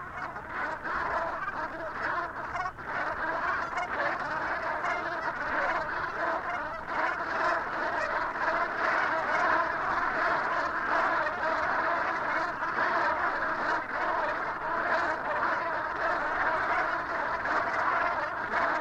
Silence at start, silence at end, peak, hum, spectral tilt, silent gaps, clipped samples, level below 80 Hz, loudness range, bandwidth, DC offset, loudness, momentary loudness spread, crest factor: 0 s; 0 s; -14 dBFS; none; -4.5 dB/octave; none; under 0.1%; -56 dBFS; 4 LU; 12 kHz; under 0.1%; -29 LUFS; 6 LU; 16 dB